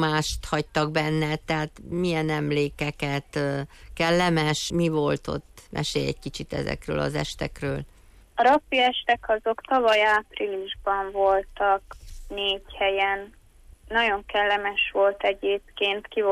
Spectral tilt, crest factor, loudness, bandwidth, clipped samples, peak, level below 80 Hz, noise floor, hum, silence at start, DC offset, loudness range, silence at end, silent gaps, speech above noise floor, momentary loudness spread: -5 dB/octave; 14 dB; -25 LUFS; 15 kHz; under 0.1%; -10 dBFS; -46 dBFS; -50 dBFS; none; 0 s; under 0.1%; 4 LU; 0 s; none; 25 dB; 10 LU